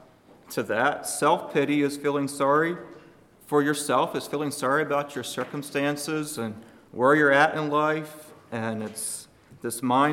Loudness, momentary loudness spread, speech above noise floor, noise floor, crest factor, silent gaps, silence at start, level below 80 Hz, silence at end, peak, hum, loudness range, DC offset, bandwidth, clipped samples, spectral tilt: -25 LUFS; 13 LU; 28 dB; -53 dBFS; 20 dB; none; 0.5 s; -70 dBFS; 0 s; -6 dBFS; none; 3 LU; under 0.1%; 17 kHz; under 0.1%; -4.5 dB/octave